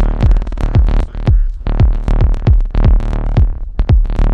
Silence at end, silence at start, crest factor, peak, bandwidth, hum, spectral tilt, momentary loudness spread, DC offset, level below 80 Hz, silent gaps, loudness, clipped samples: 0 s; 0 s; 10 dB; 0 dBFS; 4.9 kHz; none; -9 dB/octave; 4 LU; under 0.1%; -12 dBFS; none; -15 LUFS; under 0.1%